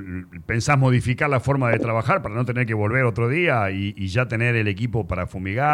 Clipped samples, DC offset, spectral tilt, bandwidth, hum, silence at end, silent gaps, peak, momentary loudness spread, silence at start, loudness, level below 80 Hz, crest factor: under 0.1%; under 0.1%; -6.5 dB/octave; 11 kHz; none; 0 s; none; -6 dBFS; 8 LU; 0 s; -21 LUFS; -44 dBFS; 14 dB